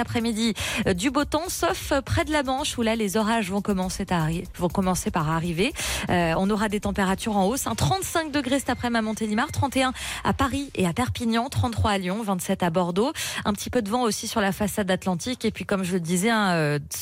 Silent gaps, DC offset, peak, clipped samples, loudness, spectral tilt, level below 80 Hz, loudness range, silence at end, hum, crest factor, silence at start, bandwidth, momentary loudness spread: none; under 0.1%; -12 dBFS; under 0.1%; -25 LUFS; -4.5 dB/octave; -42 dBFS; 1 LU; 0 s; none; 12 dB; 0 s; 16 kHz; 3 LU